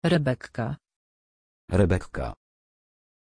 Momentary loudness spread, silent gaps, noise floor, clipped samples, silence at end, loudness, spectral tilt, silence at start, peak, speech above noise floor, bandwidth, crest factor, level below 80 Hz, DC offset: 12 LU; 0.96-1.68 s; under -90 dBFS; under 0.1%; 0.9 s; -27 LUFS; -7.5 dB/octave; 0 s; -8 dBFS; over 65 dB; 10.5 kHz; 20 dB; -44 dBFS; under 0.1%